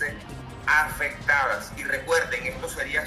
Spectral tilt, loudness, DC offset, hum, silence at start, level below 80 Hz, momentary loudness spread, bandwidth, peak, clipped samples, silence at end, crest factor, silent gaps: -3 dB/octave; -25 LUFS; under 0.1%; none; 0 s; -46 dBFS; 9 LU; 15 kHz; -8 dBFS; under 0.1%; 0 s; 18 dB; none